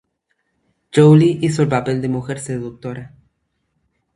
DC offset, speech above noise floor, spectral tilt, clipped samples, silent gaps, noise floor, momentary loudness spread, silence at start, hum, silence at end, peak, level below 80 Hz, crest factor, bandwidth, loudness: under 0.1%; 54 dB; -7.5 dB/octave; under 0.1%; none; -70 dBFS; 19 LU; 0.95 s; none; 1.1 s; 0 dBFS; -54 dBFS; 18 dB; 11.5 kHz; -16 LUFS